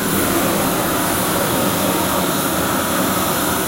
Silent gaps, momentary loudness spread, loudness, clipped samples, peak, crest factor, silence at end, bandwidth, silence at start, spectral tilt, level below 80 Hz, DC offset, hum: none; 1 LU; -17 LUFS; under 0.1%; -4 dBFS; 14 dB; 0 s; 16 kHz; 0 s; -3.5 dB/octave; -40 dBFS; under 0.1%; none